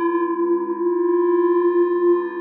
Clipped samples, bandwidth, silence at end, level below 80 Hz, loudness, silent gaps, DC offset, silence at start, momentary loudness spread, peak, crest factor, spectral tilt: under 0.1%; 3.3 kHz; 0 s; -84 dBFS; -19 LUFS; none; under 0.1%; 0 s; 4 LU; -10 dBFS; 10 dB; -5 dB/octave